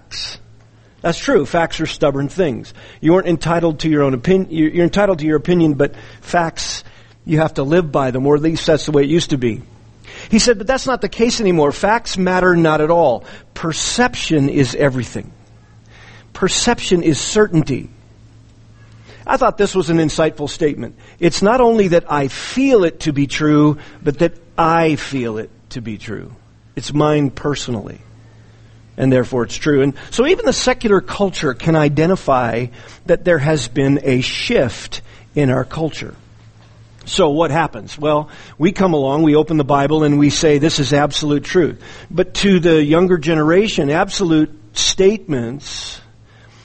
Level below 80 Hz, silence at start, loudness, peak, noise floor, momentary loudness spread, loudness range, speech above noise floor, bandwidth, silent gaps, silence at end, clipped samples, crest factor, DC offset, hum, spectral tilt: -38 dBFS; 0.1 s; -16 LUFS; 0 dBFS; -46 dBFS; 13 LU; 5 LU; 30 dB; 8.8 kHz; none; 0.65 s; under 0.1%; 16 dB; under 0.1%; none; -5 dB/octave